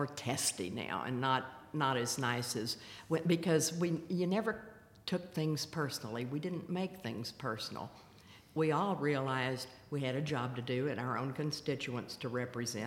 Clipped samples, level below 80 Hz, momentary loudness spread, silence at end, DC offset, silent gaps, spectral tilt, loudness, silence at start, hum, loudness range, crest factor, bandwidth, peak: under 0.1%; -72 dBFS; 9 LU; 0 s; under 0.1%; none; -4.5 dB/octave; -36 LUFS; 0 s; none; 5 LU; 20 dB; 16.5 kHz; -16 dBFS